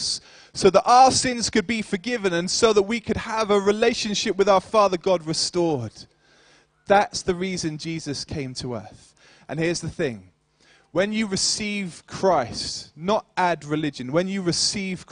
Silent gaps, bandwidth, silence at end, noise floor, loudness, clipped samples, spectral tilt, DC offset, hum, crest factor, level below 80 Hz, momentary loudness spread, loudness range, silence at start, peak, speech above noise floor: none; 10.5 kHz; 0.1 s; -59 dBFS; -22 LUFS; under 0.1%; -3.5 dB/octave; under 0.1%; none; 20 dB; -52 dBFS; 12 LU; 8 LU; 0 s; -2 dBFS; 36 dB